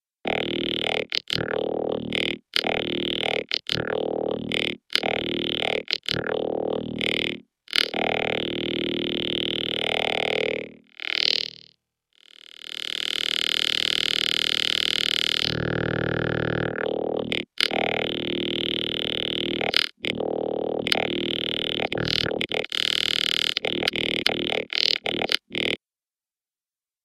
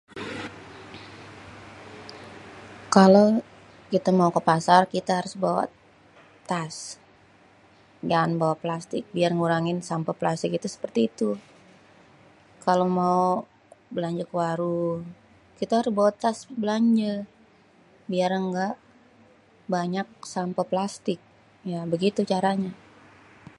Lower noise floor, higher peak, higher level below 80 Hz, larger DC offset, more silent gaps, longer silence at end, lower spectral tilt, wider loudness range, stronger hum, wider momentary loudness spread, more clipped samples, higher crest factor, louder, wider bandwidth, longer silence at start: first, under -90 dBFS vs -57 dBFS; about the same, 0 dBFS vs -2 dBFS; first, -54 dBFS vs -66 dBFS; neither; neither; first, 1.3 s vs 0.85 s; second, -3.5 dB/octave vs -6 dB/octave; second, 3 LU vs 9 LU; neither; second, 6 LU vs 21 LU; neither; about the same, 26 dB vs 24 dB; about the same, -24 LUFS vs -25 LUFS; first, 16 kHz vs 11.5 kHz; about the same, 0.25 s vs 0.15 s